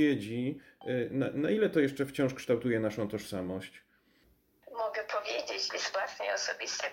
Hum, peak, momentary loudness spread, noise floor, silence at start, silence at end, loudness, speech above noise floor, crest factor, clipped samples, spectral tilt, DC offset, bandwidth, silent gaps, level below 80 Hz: none; -16 dBFS; 8 LU; -68 dBFS; 0 s; 0 s; -33 LUFS; 36 dB; 18 dB; under 0.1%; -4.5 dB/octave; under 0.1%; 16.5 kHz; none; -70 dBFS